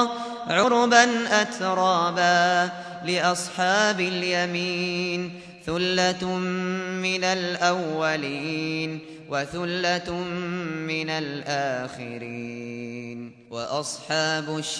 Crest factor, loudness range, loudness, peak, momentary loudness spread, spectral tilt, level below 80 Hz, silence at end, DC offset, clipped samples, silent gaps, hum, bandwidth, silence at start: 22 dB; 9 LU; -24 LUFS; -4 dBFS; 14 LU; -3.5 dB/octave; -62 dBFS; 0 s; under 0.1%; under 0.1%; none; none; 11 kHz; 0 s